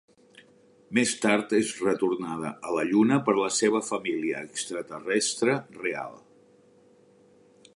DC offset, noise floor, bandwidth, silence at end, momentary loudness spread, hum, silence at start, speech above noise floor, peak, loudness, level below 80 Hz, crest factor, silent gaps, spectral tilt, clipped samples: under 0.1%; -58 dBFS; 11.5 kHz; 1.6 s; 10 LU; none; 0.9 s; 32 dB; -6 dBFS; -26 LUFS; -72 dBFS; 22 dB; none; -4 dB/octave; under 0.1%